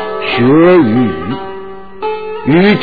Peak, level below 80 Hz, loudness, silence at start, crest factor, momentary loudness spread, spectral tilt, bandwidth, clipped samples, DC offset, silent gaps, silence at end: 0 dBFS; -42 dBFS; -11 LUFS; 0 s; 10 dB; 18 LU; -9.5 dB/octave; 4.9 kHz; under 0.1%; 3%; none; 0 s